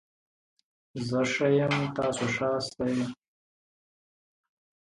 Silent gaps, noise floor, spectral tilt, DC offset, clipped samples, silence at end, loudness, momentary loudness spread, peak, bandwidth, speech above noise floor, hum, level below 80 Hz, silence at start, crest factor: none; under -90 dBFS; -5.5 dB/octave; under 0.1%; under 0.1%; 1.7 s; -28 LUFS; 10 LU; -14 dBFS; 11.5 kHz; over 62 dB; none; -64 dBFS; 0.95 s; 18 dB